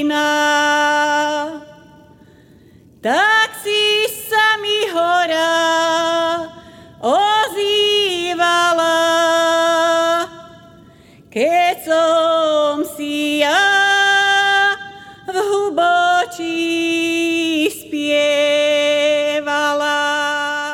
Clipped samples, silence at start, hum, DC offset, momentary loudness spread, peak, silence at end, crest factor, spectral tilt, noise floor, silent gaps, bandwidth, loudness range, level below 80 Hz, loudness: under 0.1%; 0 s; none; under 0.1%; 8 LU; -2 dBFS; 0 s; 14 dB; -1.5 dB/octave; -46 dBFS; none; 19 kHz; 3 LU; -60 dBFS; -15 LUFS